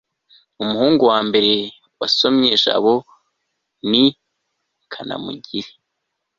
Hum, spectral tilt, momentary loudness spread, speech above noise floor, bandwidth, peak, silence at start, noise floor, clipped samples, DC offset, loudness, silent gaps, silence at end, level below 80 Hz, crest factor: none; -5 dB/octave; 15 LU; 59 dB; 7.6 kHz; -2 dBFS; 0.6 s; -76 dBFS; under 0.1%; under 0.1%; -17 LUFS; none; 0.7 s; -60 dBFS; 18 dB